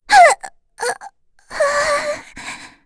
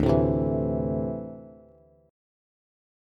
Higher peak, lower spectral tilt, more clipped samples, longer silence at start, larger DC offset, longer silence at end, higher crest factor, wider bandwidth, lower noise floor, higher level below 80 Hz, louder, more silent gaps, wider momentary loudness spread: first, 0 dBFS vs -8 dBFS; second, -0.5 dB/octave vs -10.5 dB/octave; neither; about the same, 0.1 s vs 0 s; neither; second, 0.2 s vs 1.55 s; about the same, 18 dB vs 20 dB; first, 11 kHz vs 7.4 kHz; second, -41 dBFS vs -56 dBFS; second, -50 dBFS vs -42 dBFS; first, -16 LUFS vs -27 LUFS; neither; first, 21 LU vs 17 LU